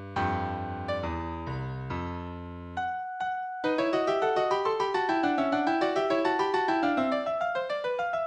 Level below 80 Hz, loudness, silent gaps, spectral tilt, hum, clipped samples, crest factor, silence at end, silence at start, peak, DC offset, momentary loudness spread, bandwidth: -52 dBFS; -29 LUFS; none; -6.5 dB/octave; none; under 0.1%; 16 dB; 0 s; 0 s; -12 dBFS; under 0.1%; 9 LU; 9.8 kHz